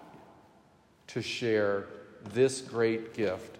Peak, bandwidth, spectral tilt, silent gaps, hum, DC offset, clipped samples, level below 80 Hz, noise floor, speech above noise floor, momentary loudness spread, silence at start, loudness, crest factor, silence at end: -14 dBFS; 13.5 kHz; -5 dB/octave; none; none; under 0.1%; under 0.1%; -76 dBFS; -62 dBFS; 32 dB; 11 LU; 0 s; -31 LUFS; 20 dB; 0 s